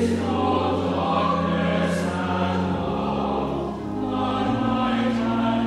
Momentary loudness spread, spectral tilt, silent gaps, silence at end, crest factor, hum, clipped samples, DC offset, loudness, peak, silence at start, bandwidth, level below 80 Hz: 4 LU; -7 dB/octave; none; 0 s; 12 dB; none; under 0.1%; under 0.1%; -23 LUFS; -10 dBFS; 0 s; 12 kHz; -44 dBFS